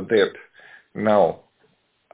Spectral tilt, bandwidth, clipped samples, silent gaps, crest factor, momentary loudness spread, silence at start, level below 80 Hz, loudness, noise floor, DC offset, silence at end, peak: -9.5 dB/octave; 4 kHz; under 0.1%; none; 18 dB; 20 LU; 0 s; -64 dBFS; -21 LUFS; -64 dBFS; under 0.1%; 0.8 s; -6 dBFS